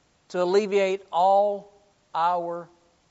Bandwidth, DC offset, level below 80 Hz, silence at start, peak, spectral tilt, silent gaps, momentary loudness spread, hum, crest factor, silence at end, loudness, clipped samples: 8 kHz; under 0.1%; -76 dBFS; 0.3 s; -10 dBFS; -3.5 dB/octave; none; 14 LU; none; 16 dB; 0.45 s; -24 LUFS; under 0.1%